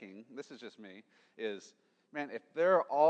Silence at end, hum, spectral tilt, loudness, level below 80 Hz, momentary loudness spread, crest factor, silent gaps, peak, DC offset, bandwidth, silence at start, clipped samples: 0 s; none; -5.5 dB/octave; -35 LUFS; under -90 dBFS; 23 LU; 20 dB; none; -16 dBFS; under 0.1%; 8.4 kHz; 0 s; under 0.1%